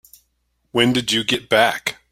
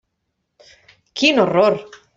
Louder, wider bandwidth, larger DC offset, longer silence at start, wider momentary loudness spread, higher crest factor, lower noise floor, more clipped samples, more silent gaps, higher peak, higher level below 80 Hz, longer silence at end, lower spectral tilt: about the same, -18 LUFS vs -16 LUFS; first, 16.5 kHz vs 8 kHz; neither; second, 0.75 s vs 1.15 s; second, 7 LU vs 13 LU; about the same, 20 dB vs 18 dB; second, -69 dBFS vs -74 dBFS; neither; neither; about the same, 0 dBFS vs -2 dBFS; first, -56 dBFS vs -62 dBFS; about the same, 0.2 s vs 0.3 s; about the same, -3.5 dB/octave vs -4.5 dB/octave